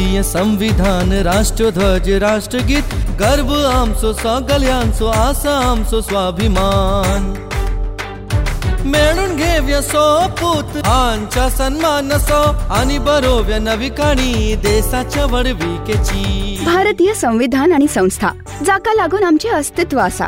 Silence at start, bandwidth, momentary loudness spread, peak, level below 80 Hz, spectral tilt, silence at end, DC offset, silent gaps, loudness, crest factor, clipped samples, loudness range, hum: 0 s; 16 kHz; 6 LU; -2 dBFS; -20 dBFS; -5 dB/octave; 0 s; under 0.1%; none; -15 LUFS; 12 dB; under 0.1%; 2 LU; none